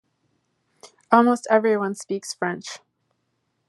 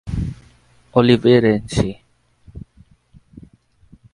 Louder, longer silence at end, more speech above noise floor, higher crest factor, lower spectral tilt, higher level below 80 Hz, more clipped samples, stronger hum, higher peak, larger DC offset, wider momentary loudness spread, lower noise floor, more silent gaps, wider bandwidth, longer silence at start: second, -21 LUFS vs -17 LUFS; second, 0.9 s vs 1.55 s; first, 52 dB vs 37 dB; about the same, 24 dB vs 20 dB; second, -5 dB/octave vs -7 dB/octave; second, -80 dBFS vs -38 dBFS; neither; neither; about the same, -2 dBFS vs 0 dBFS; neither; second, 16 LU vs 27 LU; first, -73 dBFS vs -52 dBFS; neither; about the same, 12 kHz vs 11.5 kHz; first, 0.85 s vs 0.05 s